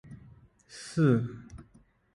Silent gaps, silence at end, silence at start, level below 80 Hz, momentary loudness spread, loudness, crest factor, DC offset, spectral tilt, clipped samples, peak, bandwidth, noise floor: none; 0.55 s; 0.1 s; -60 dBFS; 26 LU; -28 LUFS; 20 dB; under 0.1%; -7.5 dB/octave; under 0.1%; -12 dBFS; 11.5 kHz; -62 dBFS